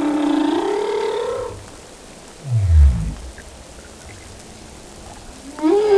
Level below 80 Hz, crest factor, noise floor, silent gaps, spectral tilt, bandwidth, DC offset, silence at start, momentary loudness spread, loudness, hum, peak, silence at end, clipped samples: -24 dBFS; 16 dB; -40 dBFS; none; -7 dB/octave; 11 kHz; under 0.1%; 0 s; 22 LU; -19 LUFS; none; -4 dBFS; 0 s; under 0.1%